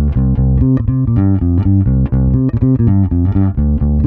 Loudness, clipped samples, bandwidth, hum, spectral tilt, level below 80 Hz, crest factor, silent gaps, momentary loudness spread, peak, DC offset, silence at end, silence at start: -13 LUFS; under 0.1%; 2.9 kHz; none; -13.5 dB/octave; -18 dBFS; 12 dB; none; 2 LU; 0 dBFS; under 0.1%; 0 s; 0 s